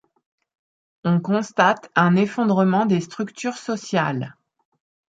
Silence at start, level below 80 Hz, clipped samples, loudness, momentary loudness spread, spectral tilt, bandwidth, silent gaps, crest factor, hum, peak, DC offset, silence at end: 1.05 s; -68 dBFS; under 0.1%; -21 LUFS; 11 LU; -6.5 dB/octave; 8 kHz; none; 20 dB; none; -2 dBFS; under 0.1%; 0.8 s